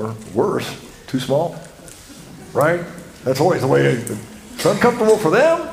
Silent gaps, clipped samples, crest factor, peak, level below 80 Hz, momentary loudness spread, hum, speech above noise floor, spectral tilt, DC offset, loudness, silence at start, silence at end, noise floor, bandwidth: none; under 0.1%; 18 dB; 0 dBFS; -50 dBFS; 23 LU; none; 22 dB; -5.5 dB/octave; under 0.1%; -18 LUFS; 0 s; 0 s; -40 dBFS; 16 kHz